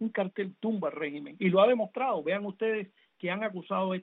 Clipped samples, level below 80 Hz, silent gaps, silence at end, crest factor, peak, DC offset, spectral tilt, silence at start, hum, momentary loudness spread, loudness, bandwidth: under 0.1%; -80 dBFS; none; 0 s; 18 dB; -12 dBFS; under 0.1%; -5 dB/octave; 0 s; none; 12 LU; -30 LUFS; 4.1 kHz